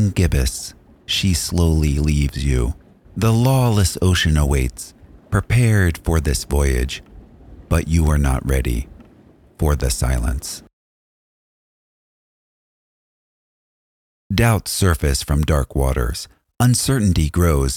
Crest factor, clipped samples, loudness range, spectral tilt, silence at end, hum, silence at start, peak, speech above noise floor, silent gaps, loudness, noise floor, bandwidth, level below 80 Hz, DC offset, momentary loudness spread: 18 dB; under 0.1%; 7 LU; -5 dB/octave; 0 s; none; 0 s; -2 dBFS; 32 dB; 10.73-14.30 s; -19 LUFS; -49 dBFS; 17.5 kHz; -26 dBFS; under 0.1%; 11 LU